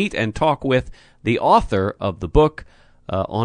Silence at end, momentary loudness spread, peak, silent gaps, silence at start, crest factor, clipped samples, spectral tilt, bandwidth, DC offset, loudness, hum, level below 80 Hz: 0 s; 11 LU; 0 dBFS; none; 0 s; 20 dB; under 0.1%; -7 dB/octave; 10 kHz; under 0.1%; -20 LUFS; none; -34 dBFS